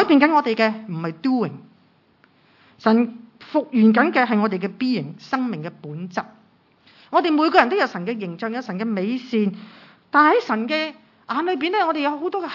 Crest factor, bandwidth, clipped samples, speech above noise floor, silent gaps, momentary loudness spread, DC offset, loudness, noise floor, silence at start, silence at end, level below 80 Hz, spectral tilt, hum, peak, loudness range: 22 dB; 6 kHz; under 0.1%; 38 dB; none; 13 LU; under 0.1%; -21 LUFS; -58 dBFS; 0 s; 0 s; -72 dBFS; -7 dB/octave; none; 0 dBFS; 3 LU